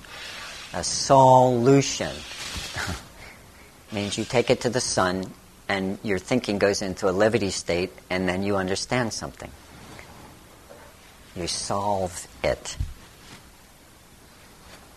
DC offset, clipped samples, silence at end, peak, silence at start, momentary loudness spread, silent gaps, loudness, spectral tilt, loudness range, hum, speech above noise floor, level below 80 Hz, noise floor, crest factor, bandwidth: under 0.1%; under 0.1%; 0.2 s; -4 dBFS; 0 s; 23 LU; none; -24 LUFS; -4.5 dB/octave; 10 LU; none; 28 dB; -48 dBFS; -51 dBFS; 22 dB; 13 kHz